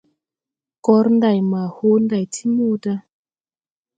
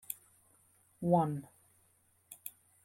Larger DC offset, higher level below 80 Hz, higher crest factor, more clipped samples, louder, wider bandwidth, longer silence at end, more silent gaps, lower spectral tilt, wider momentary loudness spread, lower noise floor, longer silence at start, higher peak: neither; first, -68 dBFS vs -74 dBFS; about the same, 18 dB vs 22 dB; neither; first, -18 LUFS vs -35 LUFS; second, 9.2 kHz vs 16.5 kHz; first, 1 s vs 0.35 s; neither; about the same, -7 dB/octave vs -7.5 dB/octave; second, 9 LU vs 18 LU; first, under -90 dBFS vs -71 dBFS; first, 0.85 s vs 0.1 s; first, -2 dBFS vs -16 dBFS